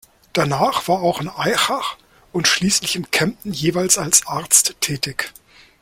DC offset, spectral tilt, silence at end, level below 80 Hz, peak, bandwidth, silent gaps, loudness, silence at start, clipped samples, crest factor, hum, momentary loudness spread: under 0.1%; -2.5 dB/octave; 0.5 s; -52 dBFS; 0 dBFS; 16.5 kHz; none; -18 LUFS; 0.35 s; under 0.1%; 20 dB; none; 11 LU